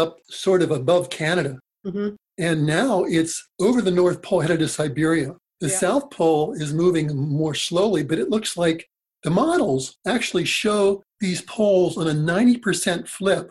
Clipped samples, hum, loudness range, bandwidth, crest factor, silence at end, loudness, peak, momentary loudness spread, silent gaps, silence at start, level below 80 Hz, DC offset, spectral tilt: under 0.1%; none; 1 LU; 13 kHz; 16 dB; 0.05 s; -21 LUFS; -6 dBFS; 8 LU; none; 0 s; -56 dBFS; under 0.1%; -5 dB/octave